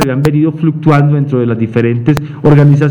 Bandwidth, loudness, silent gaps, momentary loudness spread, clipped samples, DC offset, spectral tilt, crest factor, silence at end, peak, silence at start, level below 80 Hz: 10.5 kHz; -10 LUFS; none; 6 LU; 0.8%; under 0.1%; -8.5 dB/octave; 10 dB; 0 s; 0 dBFS; 0 s; -38 dBFS